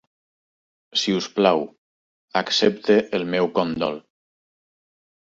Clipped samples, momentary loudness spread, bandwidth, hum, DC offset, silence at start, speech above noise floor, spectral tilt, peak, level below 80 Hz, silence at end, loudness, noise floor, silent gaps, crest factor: under 0.1%; 8 LU; 7.8 kHz; none; under 0.1%; 0.95 s; over 69 dB; -4.5 dB/octave; -4 dBFS; -62 dBFS; 1.2 s; -21 LUFS; under -90 dBFS; 1.78-2.28 s; 20 dB